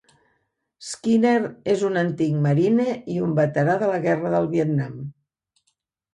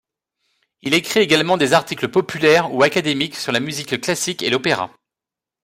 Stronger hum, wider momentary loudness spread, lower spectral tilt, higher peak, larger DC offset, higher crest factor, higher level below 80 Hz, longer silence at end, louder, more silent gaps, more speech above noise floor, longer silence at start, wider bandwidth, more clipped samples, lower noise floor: neither; first, 12 LU vs 7 LU; first, -7 dB/octave vs -3.5 dB/octave; second, -8 dBFS vs -2 dBFS; neither; about the same, 14 dB vs 18 dB; about the same, -62 dBFS vs -60 dBFS; first, 1 s vs 0.75 s; second, -22 LUFS vs -18 LUFS; neither; second, 52 dB vs 70 dB; about the same, 0.8 s vs 0.85 s; second, 11.5 kHz vs 16 kHz; neither; second, -73 dBFS vs -87 dBFS